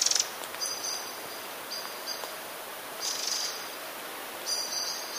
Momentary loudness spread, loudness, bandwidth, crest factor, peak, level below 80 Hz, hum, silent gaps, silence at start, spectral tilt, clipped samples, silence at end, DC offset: 9 LU; -32 LUFS; 15.5 kHz; 24 dB; -10 dBFS; -80 dBFS; none; none; 0 s; 1.5 dB/octave; under 0.1%; 0 s; under 0.1%